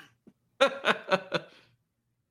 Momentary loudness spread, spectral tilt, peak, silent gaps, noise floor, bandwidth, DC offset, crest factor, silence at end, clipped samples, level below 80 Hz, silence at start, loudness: 9 LU; -3.5 dB/octave; -6 dBFS; none; -78 dBFS; 13 kHz; under 0.1%; 26 dB; 0.85 s; under 0.1%; -76 dBFS; 0.6 s; -28 LUFS